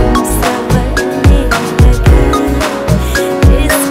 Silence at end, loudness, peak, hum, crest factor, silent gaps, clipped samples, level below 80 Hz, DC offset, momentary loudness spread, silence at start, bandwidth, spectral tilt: 0 s; -11 LUFS; 0 dBFS; none; 8 dB; none; 1%; -12 dBFS; under 0.1%; 5 LU; 0 s; 16.5 kHz; -5.5 dB/octave